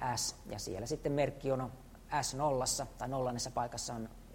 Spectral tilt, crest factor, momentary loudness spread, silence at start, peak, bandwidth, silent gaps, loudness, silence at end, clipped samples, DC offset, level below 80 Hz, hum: -4 dB/octave; 16 dB; 8 LU; 0 s; -20 dBFS; 16 kHz; none; -37 LUFS; 0 s; under 0.1%; under 0.1%; -54 dBFS; none